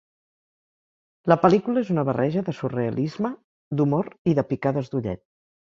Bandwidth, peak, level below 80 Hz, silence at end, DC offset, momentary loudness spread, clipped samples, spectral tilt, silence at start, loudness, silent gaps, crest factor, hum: 7.4 kHz; -2 dBFS; -58 dBFS; 0.65 s; under 0.1%; 12 LU; under 0.1%; -9 dB/octave; 1.25 s; -24 LUFS; 3.44-3.71 s, 4.19-4.25 s; 22 dB; none